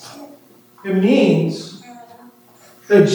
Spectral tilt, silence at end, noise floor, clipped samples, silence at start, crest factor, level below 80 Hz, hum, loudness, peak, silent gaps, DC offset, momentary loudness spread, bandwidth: -6.5 dB/octave; 0 s; -48 dBFS; under 0.1%; 0.05 s; 18 dB; -76 dBFS; none; -16 LUFS; 0 dBFS; none; under 0.1%; 24 LU; over 20 kHz